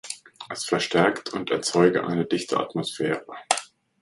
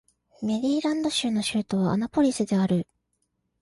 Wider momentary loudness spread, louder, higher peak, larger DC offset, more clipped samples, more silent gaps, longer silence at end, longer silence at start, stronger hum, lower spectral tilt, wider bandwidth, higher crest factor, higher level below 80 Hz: first, 12 LU vs 5 LU; about the same, -24 LUFS vs -25 LUFS; first, 0 dBFS vs -12 dBFS; neither; neither; neither; second, 0.35 s vs 0.8 s; second, 0.05 s vs 0.4 s; neither; second, -4 dB/octave vs -5.5 dB/octave; about the same, 11.5 kHz vs 11.5 kHz; first, 24 dB vs 14 dB; second, -66 dBFS vs -60 dBFS